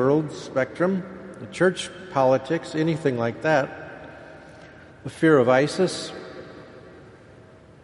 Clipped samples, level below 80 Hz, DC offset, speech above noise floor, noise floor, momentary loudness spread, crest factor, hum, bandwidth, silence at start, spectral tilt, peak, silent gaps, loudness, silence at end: under 0.1%; -60 dBFS; under 0.1%; 26 dB; -49 dBFS; 22 LU; 20 dB; none; 11.5 kHz; 0 s; -6 dB/octave; -6 dBFS; none; -23 LUFS; 0.8 s